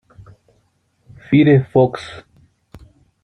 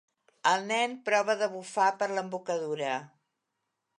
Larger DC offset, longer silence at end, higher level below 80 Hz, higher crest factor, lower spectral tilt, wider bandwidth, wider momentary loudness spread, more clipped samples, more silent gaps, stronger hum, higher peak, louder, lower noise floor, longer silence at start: neither; first, 1.05 s vs 0.9 s; first, -52 dBFS vs -88 dBFS; about the same, 18 dB vs 20 dB; first, -9 dB/octave vs -3 dB/octave; second, 9.4 kHz vs 11 kHz; first, 22 LU vs 7 LU; neither; neither; neither; first, -2 dBFS vs -10 dBFS; first, -14 LUFS vs -29 LUFS; second, -62 dBFS vs -83 dBFS; first, 1.3 s vs 0.45 s